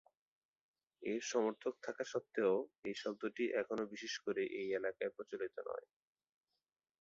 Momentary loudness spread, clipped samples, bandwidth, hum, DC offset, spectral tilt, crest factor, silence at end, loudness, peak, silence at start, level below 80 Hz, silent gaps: 9 LU; under 0.1%; 7.6 kHz; none; under 0.1%; -3 dB/octave; 20 dB; 1.2 s; -41 LUFS; -22 dBFS; 1 s; -84 dBFS; 2.79-2.83 s